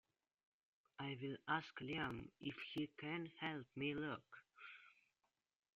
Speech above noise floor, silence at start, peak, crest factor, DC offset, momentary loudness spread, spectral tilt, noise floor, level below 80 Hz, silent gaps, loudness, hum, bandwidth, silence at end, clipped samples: 42 dB; 1 s; -28 dBFS; 22 dB; under 0.1%; 15 LU; -3.5 dB/octave; -90 dBFS; -78 dBFS; none; -47 LUFS; none; 7.4 kHz; 0.85 s; under 0.1%